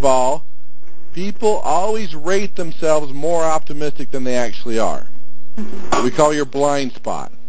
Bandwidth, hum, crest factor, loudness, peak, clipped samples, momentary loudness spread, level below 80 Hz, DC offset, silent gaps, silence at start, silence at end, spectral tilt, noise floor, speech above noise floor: 8 kHz; none; 20 dB; -20 LUFS; 0 dBFS; under 0.1%; 13 LU; -48 dBFS; 30%; none; 0 s; 0 s; -4.5 dB/octave; -49 dBFS; 32 dB